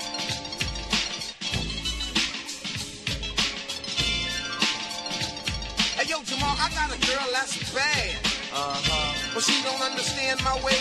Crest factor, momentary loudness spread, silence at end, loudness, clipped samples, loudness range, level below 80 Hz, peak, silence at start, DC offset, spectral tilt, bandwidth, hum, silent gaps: 20 dB; 7 LU; 0 s; -26 LUFS; under 0.1%; 3 LU; -42 dBFS; -8 dBFS; 0 s; under 0.1%; -2 dB/octave; 13 kHz; none; none